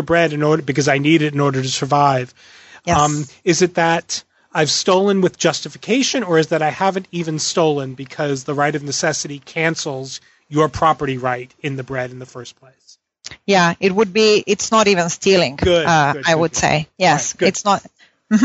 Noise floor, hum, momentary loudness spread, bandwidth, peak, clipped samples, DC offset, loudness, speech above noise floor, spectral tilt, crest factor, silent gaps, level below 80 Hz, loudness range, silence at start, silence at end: -42 dBFS; none; 11 LU; 8.2 kHz; 0 dBFS; under 0.1%; under 0.1%; -17 LUFS; 25 dB; -4 dB/octave; 18 dB; none; -46 dBFS; 6 LU; 0 s; 0 s